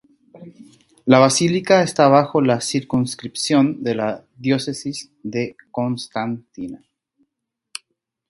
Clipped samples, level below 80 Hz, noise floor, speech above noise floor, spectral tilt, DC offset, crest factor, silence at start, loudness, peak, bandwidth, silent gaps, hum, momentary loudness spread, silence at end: under 0.1%; -60 dBFS; -79 dBFS; 60 dB; -5 dB/octave; under 0.1%; 20 dB; 0.35 s; -19 LUFS; 0 dBFS; 11.5 kHz; none; none; 19 LU; 1.55 s